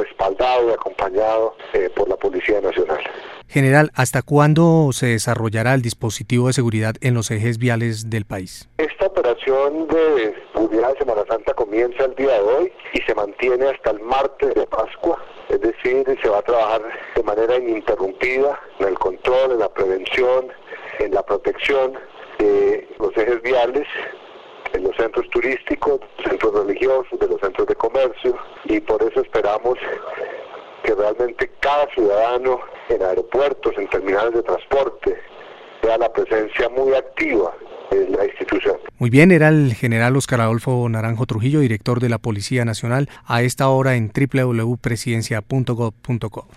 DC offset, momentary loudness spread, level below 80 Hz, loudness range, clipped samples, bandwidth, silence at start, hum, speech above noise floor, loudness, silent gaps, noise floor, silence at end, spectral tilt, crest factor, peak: under 0.1%; 8 LU; -44 dBFS; 4 LU; under 0.1%; 14 kHz; 0 s; none; 21 dB; -19 LUFS; none; -39 dBFS; 0.15 s; -6.5 dB/octave; 18 dB; 0 dBFS